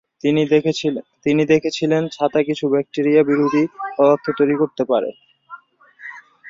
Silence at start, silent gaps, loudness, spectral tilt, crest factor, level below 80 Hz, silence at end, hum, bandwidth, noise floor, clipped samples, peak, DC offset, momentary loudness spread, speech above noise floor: 0.25 s; none; -18 LUFS; -6.5 dB/octave; 16 dB; -62 dBFS; 0 s; none; 7.6 kHz; -46 dBFS; under 0.1%; -2 dBFS; under 0.1%; 8 LU; 29 dB